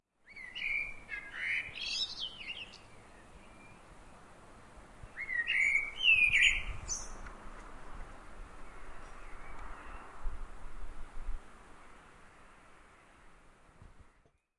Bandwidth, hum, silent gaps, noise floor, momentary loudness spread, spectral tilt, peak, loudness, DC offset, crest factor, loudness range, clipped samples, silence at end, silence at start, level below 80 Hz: 11.5 kHz; none; none; -69 dBFS; 27 LU; -0.5 dB/octave; -14 dBFS; -31 LUFS; under 0.1%; 24 dB; 22 LU; under 0.1%; 0.5 s; 0.3 s; -48 dBFS